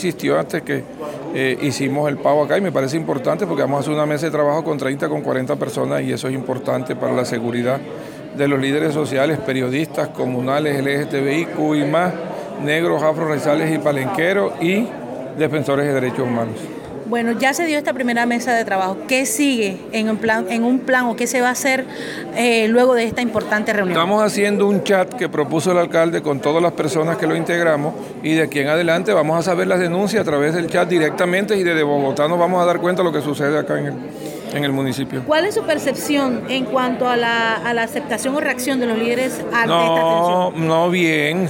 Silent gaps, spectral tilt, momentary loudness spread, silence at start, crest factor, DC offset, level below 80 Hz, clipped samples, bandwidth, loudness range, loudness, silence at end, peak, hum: none; -5 dB/octave; 6 LU; 0 s; 14 dB; under 0.1%; -60 dBFS; under 0.1%; 17 kHz; 3 LU; -18 LUFS; 0 s; -4 dBFS; none